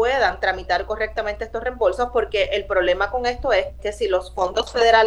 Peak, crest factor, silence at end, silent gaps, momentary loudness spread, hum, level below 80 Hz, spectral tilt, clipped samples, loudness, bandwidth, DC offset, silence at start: -2 dBFS; 18 dB; 0 s; none; 7 LU; none; -38 dBFS; -3.5 dB/octave; under 0.1%; -22 LUFS; 11.5 kHz; under 0.1%; 0 s